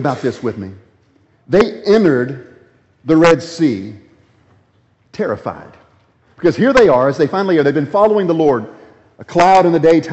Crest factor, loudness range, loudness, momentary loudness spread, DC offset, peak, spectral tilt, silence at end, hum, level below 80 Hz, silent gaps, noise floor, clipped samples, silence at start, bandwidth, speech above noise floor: 14 dB; 5 LU; -14 LUFS; 19 LU; under 0.1%; 0 dBFS; -6.5 dB/octave; 0 s; none; -48 dBFS; none; -56 dBFS; under 0.1%; 0 s; 8.2 kHz; 43 dB